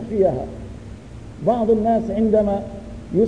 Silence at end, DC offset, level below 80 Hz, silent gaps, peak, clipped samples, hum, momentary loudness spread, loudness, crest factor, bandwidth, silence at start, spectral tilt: 0 s; 0.3%; -40 dBFS; none; -6 dBFS; under 0.1%; none; 20 LU; -20 LUFS; 14 dB; 9.8 kHz; 0 s; -9 dB/octave